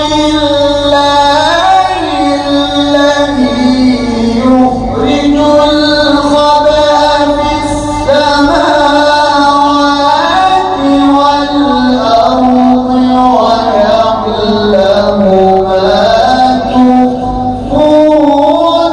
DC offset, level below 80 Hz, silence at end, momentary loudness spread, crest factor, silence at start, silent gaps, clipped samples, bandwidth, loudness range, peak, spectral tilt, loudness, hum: under 0.1%; -30 dBFS; 0 s; 4 LU; 8 dB; 0 s; none; 2%; 12 kHz; 1 LU; 0 dBFS; -5 dB/octave; -8 LUFS; none